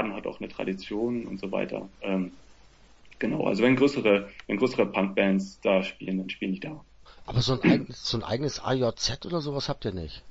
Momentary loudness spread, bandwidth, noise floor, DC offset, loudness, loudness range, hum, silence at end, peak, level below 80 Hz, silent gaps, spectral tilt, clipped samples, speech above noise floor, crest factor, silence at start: 12 LU; 8 kHz; -54 dBFS; under 0.1%; -28 LUFS; 5 LU; none; 0 s; -8 dBFS; -52 dBFS; none; -5.5 dB/octave; under 0.1%; 27 dB; 20 dB; 0 s